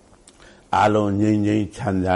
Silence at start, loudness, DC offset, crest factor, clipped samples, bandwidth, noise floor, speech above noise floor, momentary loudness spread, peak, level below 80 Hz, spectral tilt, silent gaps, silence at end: 0.7 s; -20 LUFS; under 0.1%; 14 dB; under 0.1%; 11 kHz; -49 dBFS; 30 dB; 6 LU; -6 dBFS; -50 dBFS; -7 dB/octave; none; 0 s